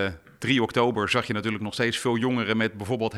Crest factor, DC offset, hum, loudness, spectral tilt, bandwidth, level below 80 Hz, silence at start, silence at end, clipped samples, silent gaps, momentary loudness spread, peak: 18 dB; under 0.1%; none; -25 LUFS; -5 dB/octave; 13.5 kHz; -58 dBFS; 0 s; 0 s; under 0.1%; none; 6 LU; -8 dBFS